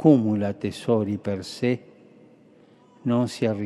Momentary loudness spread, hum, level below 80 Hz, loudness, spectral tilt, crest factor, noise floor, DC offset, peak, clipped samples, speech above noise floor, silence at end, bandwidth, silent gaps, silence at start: 10 LU; none; -68 dBFS; -25 LUFS; -7.5 dB/octave; 20 dB; -54 dBFS; under 0.1%; -4 dBFS; under 0.1%; 32 dB; 0 s; 12 kHz; none; 0 s